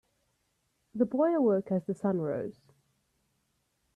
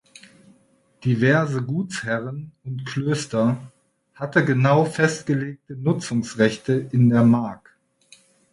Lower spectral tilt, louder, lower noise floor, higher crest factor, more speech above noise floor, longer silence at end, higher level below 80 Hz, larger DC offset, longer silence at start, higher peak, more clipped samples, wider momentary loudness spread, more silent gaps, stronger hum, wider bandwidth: first, -10 dB/octave vs -6.5 dB/octave; second, -30 LUFS vs -21 LUFS; first, -77 dBFS vs -60 dBFS; about the same, 18 dB vs 18 dB; first, 48 dB vs 39 dB; first, 1.45 s vs 0.95 s; second, -74 dBFS vs -60 dBFS; neither; about the same, 0.95 s vs 1 s; second, -14 dBFS vs -4 dBFS; neither; about the same, 12 LU vs 14 LU; neither; neither; second, 10 kHz vs 11.5 kHz